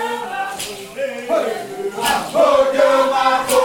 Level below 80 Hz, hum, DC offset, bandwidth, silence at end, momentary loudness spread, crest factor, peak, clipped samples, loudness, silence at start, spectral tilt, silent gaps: -54 dBFS; none; under 0.1%; 19 kHz; 0 s; 12 LU; 14 dB; -2 dBFS; under 0.1%; -17 LUFS; 0 s; -2.5 dB/octave; none